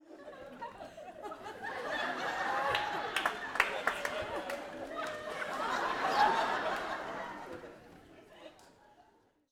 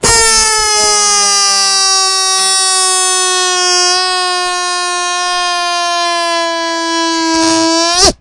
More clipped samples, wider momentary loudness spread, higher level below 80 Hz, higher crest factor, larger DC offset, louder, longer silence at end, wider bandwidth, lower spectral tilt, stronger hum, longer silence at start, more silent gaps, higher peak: second, under 0.1% vs 0.2%; first, 18 LU vs 6 LU; second, -66 dBFS vs -36 dBFS; first, 26 dB vs 12 dB; neither; second, -35 LUFS vs -9 LUFS; first, 0.5 s vs 0.05 s; first, over 20 kHz vs 12 kHz; first, -2.5 dB/octave vs 0 dB/octave; neither; about the same, 0.05 s vs 0 s; neither; second, -10 dBFS vs 0 dBFS